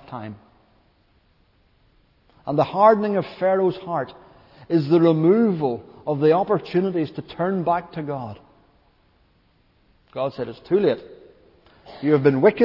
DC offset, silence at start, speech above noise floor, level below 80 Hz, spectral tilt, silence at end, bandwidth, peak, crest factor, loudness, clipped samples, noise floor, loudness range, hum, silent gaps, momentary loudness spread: under 0.1%; 0.1 s; 41 dB; -62 dBFS; -10 dB/octave; 0 s; 5.8 kHz; -2 dBFS; 20 dB; -21 LUFS; under 0.1%; -61 dBFS; 8 LU; none; none; 16 LU